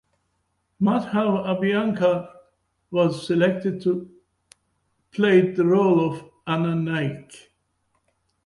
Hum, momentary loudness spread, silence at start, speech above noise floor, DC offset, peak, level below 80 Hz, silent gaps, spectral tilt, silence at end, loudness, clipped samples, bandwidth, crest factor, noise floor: none; 11 LU; 0.8 s; 51 dB; under 0.1%; -6 dBFS; -64 dBFS; none; -7.5 dB/octave; 1.05 s; -22 LUFS; under 0.1%; 11.5 kHz; 18 dB; -72 dBFS